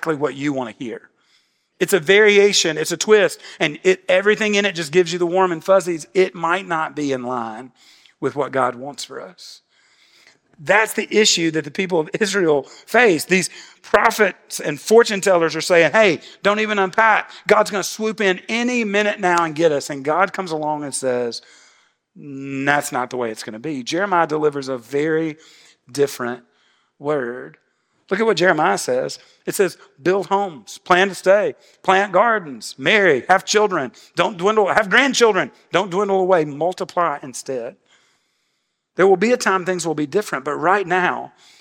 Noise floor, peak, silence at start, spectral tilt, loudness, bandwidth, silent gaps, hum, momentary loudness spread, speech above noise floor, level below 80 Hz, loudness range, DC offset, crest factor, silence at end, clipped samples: -71 dBFS; 0 dBFS; 0 s; -3.5 dB/octave; -18 LUFS; 17 kHz; none; none; 13 LU; 53 dB; -64 dBFS; 7 LU; under 0.1%; 18 dB; 0.35 s; under 0.1%